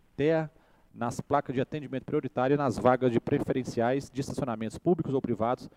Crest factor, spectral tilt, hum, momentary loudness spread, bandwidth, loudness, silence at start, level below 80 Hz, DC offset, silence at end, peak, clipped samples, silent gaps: 22 dB; -7 dB/octave; none; 10 LU; 14.5 kHz; -29 LUFS; 0.2 s; -58 dBFS; under 0.1%; 0.1 s; -8 dBFS; under 0.1%; none